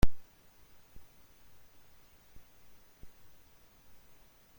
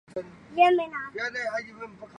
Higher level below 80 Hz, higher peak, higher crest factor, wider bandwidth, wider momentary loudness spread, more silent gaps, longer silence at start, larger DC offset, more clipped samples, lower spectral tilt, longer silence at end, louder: first, -44 dBFS vs -68 dBFS; second, -10 dBFS vs -6 dBFS; about the same, 24 dB vs 20 dB; first, 16.5 kHz vs 9.8 kHz; second, 2 LU vs 18 LU; neither; about the same, 0.05 s vs 0.15 s; neither; neither; first, -6 dB/octave vs -4.5 dB/octave; first, 1.3 s vs 0 s; second, -53 LUFS vs -26 LUFS